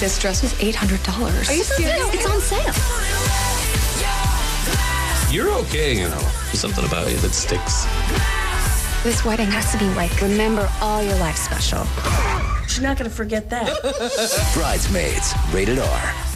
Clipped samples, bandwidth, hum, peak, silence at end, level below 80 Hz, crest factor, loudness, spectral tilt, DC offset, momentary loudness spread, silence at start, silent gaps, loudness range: under 0.1%; 16 kHz; none; -8 dBFS; 0 s; -24 dBFS; 12 dB; -20 LUFS; -4 dB/octave; 0.1%; 3 LU; 0 s; none; 2 LU